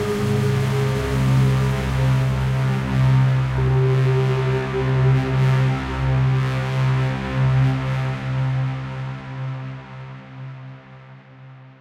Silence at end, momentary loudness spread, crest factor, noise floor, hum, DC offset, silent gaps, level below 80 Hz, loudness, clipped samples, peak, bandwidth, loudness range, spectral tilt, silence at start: 0.1 s; 15 LU; 12 dB; -42 dBFS; none; under 0.1%; none; -34 dBFS; -20 LUFS; under 0.1%; -8 dBFS; 9.8 kHz; 9 LU; -7.5 dB/octave; 0 s